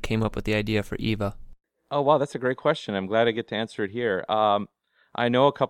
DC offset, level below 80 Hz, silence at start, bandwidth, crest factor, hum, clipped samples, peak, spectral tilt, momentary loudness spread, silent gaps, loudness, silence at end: under 0.1%; -46 dBFS; 0 s; 16 kHz; 20 dB; none; under 0.1%; -6 dBFS; -6.5 dB/octave; 8 LU; none; -25 LUFS; 0 s